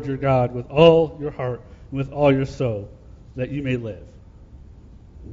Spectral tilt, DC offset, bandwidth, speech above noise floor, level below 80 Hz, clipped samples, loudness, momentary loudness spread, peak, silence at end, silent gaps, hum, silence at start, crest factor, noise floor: -8 dB/octave; under 0.1%; 7.6 kHz; 24 dB; -44 dBFS; under 0.1%; -21 LUFS; 21 LU; -2 dBFS; 0 s; none; none; 0 s; 20 dB; -44 dBFS